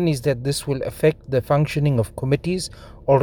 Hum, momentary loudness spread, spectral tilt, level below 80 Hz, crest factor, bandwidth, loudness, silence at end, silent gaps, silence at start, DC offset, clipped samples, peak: none; 7 LU; -6.5 dB/octave; -44 dBFS; 18 dB; 19.5 kHz; -22 LUFS; 0 s; none; 0 s; under 0.1%; under 0.1%; -4 dBFS